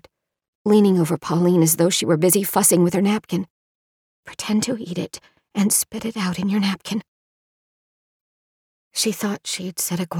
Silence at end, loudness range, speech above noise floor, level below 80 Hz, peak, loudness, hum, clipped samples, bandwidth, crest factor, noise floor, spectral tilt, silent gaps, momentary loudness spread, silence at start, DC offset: 0 s; 10 LU; over 70 dB; -62 dBFS; -4 dBFS; -20 LUFS; none; under 0.1%; over 20 kHz; 18 dB; under -90 dBFS; -4.5 dB/octave; 3.50-4.23 s, 7.08-8.91 s; 13 LU; 0.65 s; under 0.1%